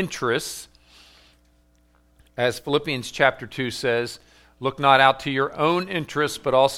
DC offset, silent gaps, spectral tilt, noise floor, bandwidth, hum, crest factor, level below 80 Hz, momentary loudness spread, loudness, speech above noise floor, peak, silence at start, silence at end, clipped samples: under 0.1%; none; -4 dB/octave; -60 dBFS; 16.5 kHz; 60 Hz at -55 dBFS; 22 dB; -56 dBFS; 13 LU; -22 LUFS; 38 dB; 0 dBFS; 0 s; 0 s; under 0.1%